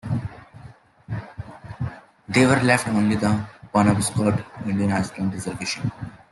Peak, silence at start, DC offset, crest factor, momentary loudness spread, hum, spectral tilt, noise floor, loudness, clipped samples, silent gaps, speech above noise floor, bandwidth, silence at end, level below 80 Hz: -4 dBFS; 0.05 s; under 0.1%; 20 dB; 18 LU; none; -5.5 dB/octave; -46 dBFS; -22 LUFS; under 0.1%; none; 25 dB; 12.5 kHz; 0.15 s; -50 dBFS